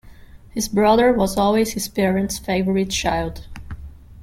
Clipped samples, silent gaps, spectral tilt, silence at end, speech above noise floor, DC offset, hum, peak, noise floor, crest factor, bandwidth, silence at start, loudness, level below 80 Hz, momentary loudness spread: under 0.1%; none; -4.5 dB/octave; 0 s; 23 dB; under 0.1%; none; -4 dBFS; -42 dBFS; 16 dB; 16.5 kHz; 0.05 s; -19 LUFS; -38 dBFS; 21 LU